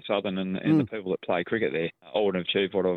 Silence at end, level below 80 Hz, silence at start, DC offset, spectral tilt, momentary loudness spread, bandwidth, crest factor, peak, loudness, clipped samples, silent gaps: 0 s; -68 dBFS; 0.05 s; under 0.1%; -8.5 dB/octave; 6 LU; 4.4 kHz; 16 dB; -10 dBFS; -27 LUFS; under 0.1%; none